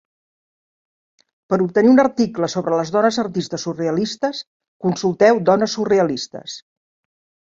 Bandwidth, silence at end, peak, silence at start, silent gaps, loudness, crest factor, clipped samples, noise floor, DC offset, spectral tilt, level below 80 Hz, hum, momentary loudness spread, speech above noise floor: 7.8 kHz; 0.9 s; -2 dBFS; 1.5 s; 4.47-4.60 s, 4.68-4.80 s; -18 LUFS; 18 dB; under 0.1%; under -90 dBFS; under 0.1%; -5.5 dB/octave; -62 dBFS; none; 13 LU; over 72 dB